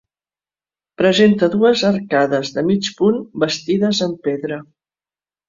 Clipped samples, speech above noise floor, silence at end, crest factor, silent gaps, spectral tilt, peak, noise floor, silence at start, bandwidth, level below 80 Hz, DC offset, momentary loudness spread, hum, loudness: under 0.1%; over 74 dB; 0.85 s; 16 dB; none; -5.5 dB/octave; -2 dBFS; under -90 dBFS; 1 s; 7.6 kHz; -58 dBFS; under 0.1%; 9 LU; 50 Hz at -40 dBFS; -17 LUFS